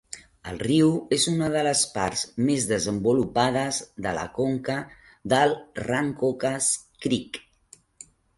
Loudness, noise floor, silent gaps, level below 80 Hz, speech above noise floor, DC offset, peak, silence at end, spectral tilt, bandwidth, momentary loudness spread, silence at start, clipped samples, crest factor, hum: -24 LUFS; -56 dBFS; none; -54 dBFS; 32 dB; under 0.1%; -8 dBFS; 1 s; -4 dB/octave; 11.5 kHz; 10 LU; 0.15 s; under 0.1%; 18 dB; none